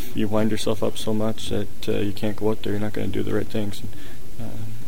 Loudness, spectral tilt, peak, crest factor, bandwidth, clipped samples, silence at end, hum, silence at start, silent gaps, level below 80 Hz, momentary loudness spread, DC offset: -26 LUFS; -6 dB/octave; -6 dBFS; 18 dB; 16.5 kHz; under 0.1%; 0 s; none; 0 s; none; -44 dBFS; 13 LU; 10%